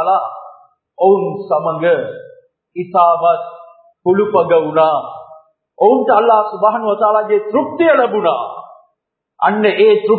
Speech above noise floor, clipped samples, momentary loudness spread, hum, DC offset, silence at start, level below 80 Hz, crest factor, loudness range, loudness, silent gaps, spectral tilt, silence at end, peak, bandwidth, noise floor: 58 dB; under 0.1%; 16 LU; none; under 0.1%; 0 s; -68 dBFS; 14 dB; 3 LU; -14 LUFS; none; -9.5 dB/octave; 0 s; 0 dBFS; 4.5 kHz; -71 dBFS